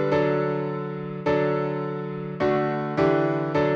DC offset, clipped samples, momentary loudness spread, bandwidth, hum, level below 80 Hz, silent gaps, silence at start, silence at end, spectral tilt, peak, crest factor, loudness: under 0.1%; under 0.1%; 9 LU; 7 kHz; none; -56 dBFS; none; 0 s; 0 s; -8.5 dB/octave; -8 dBFS; 16 dB; -25 LUFS